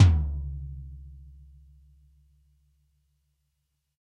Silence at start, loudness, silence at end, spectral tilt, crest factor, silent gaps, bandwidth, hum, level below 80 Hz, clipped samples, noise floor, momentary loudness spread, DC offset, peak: 0 s; -29 LUFS; 2.85 s; -7 dB/octave; 24 dB; none; 7 kHz; none; -36 dBFS; under 0.1%; -78 dBFS; 26 LU; under 0.1%; -6 dBFS